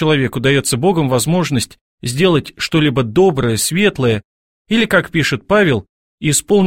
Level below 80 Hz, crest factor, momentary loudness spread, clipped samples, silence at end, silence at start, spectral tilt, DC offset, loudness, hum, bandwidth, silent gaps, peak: -44 dBFS; 14 dB; 7 LU; under 0.1%; 0 s; 0 s; -4.5 dB/octave; 0.4%; -15 LUFS; none; 16.5 kHz; 1.81-1.98 s, 4.25-4.65 s, 5.89-6.18 s; 0 dBFS